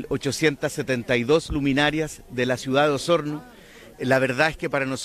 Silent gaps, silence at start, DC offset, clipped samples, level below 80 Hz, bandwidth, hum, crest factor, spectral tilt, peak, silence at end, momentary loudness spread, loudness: none; 0 s; under 0.1%; under 0.1%; -46 dBFS; 15 kHz; none; 16 dB; -5 dB/octave; -6 dBFS; 0 s; 8 LU; -23 LUFS